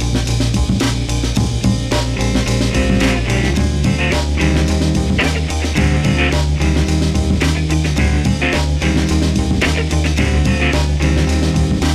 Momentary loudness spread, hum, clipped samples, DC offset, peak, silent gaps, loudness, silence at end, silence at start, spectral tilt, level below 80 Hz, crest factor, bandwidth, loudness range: 2 LU; none; under 0.1%; under 0.1%; -2 dBFS; none; -16 LUFS; 0 s; 0 s; -5.5 dB/octave; -20 dBFS; 14 dB; 13.5 kHz; 1 LU